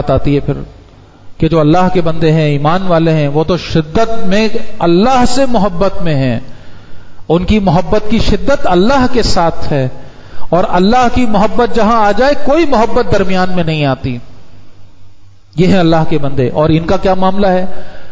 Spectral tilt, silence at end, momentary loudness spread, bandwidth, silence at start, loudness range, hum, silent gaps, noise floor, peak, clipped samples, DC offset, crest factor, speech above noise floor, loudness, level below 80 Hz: -7 dB/octave; 0 s; 7 LU; 8 kHz; 0 s; 3 LU; none; none; -38 dBFS; 0 dBFS; under 0.1%; under 0.1%; 10 dB; 29 dB; -12 LUFS; -26 dBFS